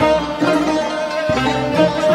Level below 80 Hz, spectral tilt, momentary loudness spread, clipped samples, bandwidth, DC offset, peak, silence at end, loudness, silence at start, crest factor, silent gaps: -40 dBFS; -5.5 dB/octave; 4 LU; under 0.1%; 13.5 kHz; under 0.1%; -2 dBFS; 0 s; -17 LUFS; 0 s; 14 dB; none